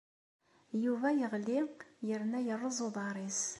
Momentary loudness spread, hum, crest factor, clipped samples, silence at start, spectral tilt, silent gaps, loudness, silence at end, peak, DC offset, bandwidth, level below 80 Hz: 7 LU; none; 16 dB; under 0.1%; 0.7 s; -4 dB/octave; none; -36 LUFS; 0 s; -20 dBFS; under 0.1%; 11.5 kHz; -84 dBFS